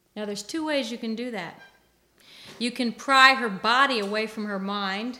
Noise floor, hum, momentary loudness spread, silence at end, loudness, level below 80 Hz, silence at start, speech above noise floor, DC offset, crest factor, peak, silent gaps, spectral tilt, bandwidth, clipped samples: -62 dBFS; none; 17 LU; 0 s; -24 LUFS; -70 dBFS; 0.15 s; 38 dB; under 0.1%; 24 dB; -2 dBFS; none; -3 dB/octave; 17 kHz; under 0.1%